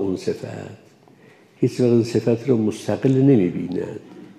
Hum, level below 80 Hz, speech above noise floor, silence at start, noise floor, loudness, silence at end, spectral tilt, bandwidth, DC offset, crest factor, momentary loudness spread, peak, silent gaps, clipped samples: none; -66 dBFS; 31 dB; 0 s; -50 dBFS; -20 LUFS; 0.05 s; -8 dB/octave; 13 kHz; under 0.1%; 16 dB; 17 LU; -4 dBFS; none; under 0.1%